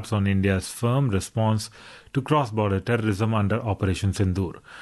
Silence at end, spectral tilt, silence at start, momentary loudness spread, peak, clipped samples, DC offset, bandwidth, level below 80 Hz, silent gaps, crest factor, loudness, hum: 0 s; -6.5 dB/octave; 0 s; 7 LU; -8 dBFS; under 0.1%; under 0.1%; 12.5 kHz; -40 dBFS; none; 16 dB; -24 LUFS; none